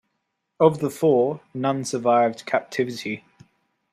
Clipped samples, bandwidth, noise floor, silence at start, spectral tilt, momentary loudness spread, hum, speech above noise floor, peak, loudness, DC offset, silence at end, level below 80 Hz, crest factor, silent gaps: under 0.1%; 15 kHz; -77 dBFS; 0.6 s; -6 dB/octave; 8 LU; none; 55 dB; -4 dBFS; -22 LUFS; under 0.1%; 0.75 s; -68 dBFS; 20 dB; none